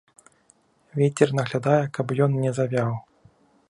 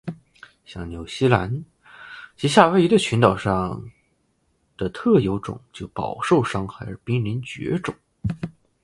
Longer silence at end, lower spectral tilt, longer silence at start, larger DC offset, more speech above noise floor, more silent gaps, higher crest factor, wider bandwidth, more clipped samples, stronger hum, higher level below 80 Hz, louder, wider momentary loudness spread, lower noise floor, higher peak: first, 0.7 s vs 0.35 s; about the same, -7 dB/octave vs -6 dB/octave; first, 0.95 s vs 0.05 s; neither; second, 39 dB vs 46 dB; neither; about the same, 20 dB vs 22 dB; about the same, 11 kHz vs 11.5 kHz; neither; neither; second, -64 dBFS vs -46 dBFS; about the same, -23 LUFS vs -22 LUFS; second, 7 LU vs 19 LU; second, -62 dBFS vs -67 dBFS; second, -4 dBFS vs 0 dBFS